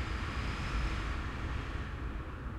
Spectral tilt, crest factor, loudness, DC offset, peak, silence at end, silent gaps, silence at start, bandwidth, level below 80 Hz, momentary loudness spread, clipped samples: -5.5 dB/octave; 12 dB; -38 LUFS; under 0.1%; -24 dBFS; 0 s; none; 0 s; 11 kHz; -40 dBFS; 5 LU; under 0.1%